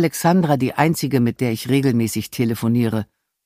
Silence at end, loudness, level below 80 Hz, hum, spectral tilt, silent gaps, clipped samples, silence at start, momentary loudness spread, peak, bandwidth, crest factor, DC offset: 0.4 s; -19 LUFS; -56 dBFS; none; -6 dB/octave; none; under 0.1%; 0 s; 6 LU; -2 dBFS; 15.5 kHz; 18 dB; under 0.1%